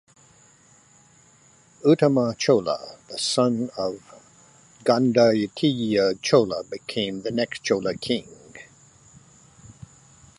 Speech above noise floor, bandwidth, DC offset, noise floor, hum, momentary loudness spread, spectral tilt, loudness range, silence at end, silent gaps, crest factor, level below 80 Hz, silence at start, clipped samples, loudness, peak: 34 dB; 11.5 kHz; under 0.1%; -56 dBFS; none; 12 LU; -5 dB/octave; 7 LU; 1.75 s; none; 22 dB; -62 dBFS; 1.85 s; under 0.1%; -23 LUFS; -4 dBFS